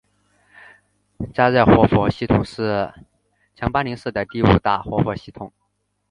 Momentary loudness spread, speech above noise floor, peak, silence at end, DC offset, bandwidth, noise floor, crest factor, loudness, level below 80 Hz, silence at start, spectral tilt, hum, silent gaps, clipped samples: 18 LU; 53 dB; 0 dBFS; 0.65 s; under 0.1%; 10.5 kHz; -71 dBFS; 20 dB; -19 LUFS; -38 dBFS; 1.2 s; -8.5 dB/octave; 50 Hz at -40 dBFS; none; under 0.1%